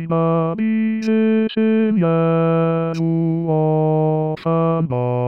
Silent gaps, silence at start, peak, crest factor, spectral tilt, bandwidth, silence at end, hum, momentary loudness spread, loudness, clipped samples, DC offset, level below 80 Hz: none; 0 s; -8 dBFS; 8 dB; -9.5 dB/octave; 6.2 kHz; 0 s; none; 3 LU; -18 LUFS; under 0.1%; 0.2%; -62 dBFS